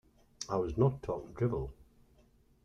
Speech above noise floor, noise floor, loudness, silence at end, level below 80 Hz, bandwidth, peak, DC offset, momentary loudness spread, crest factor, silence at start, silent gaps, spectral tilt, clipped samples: 33 dB; -66 dBFS; -35 LUFS; 0.8 s; -52 dBFS; 9.6 kHz; -16 dBFS; under 0.1%; 12 LU; 20 dB; 0.4 s; none; -7 dB/octave; under 0.1%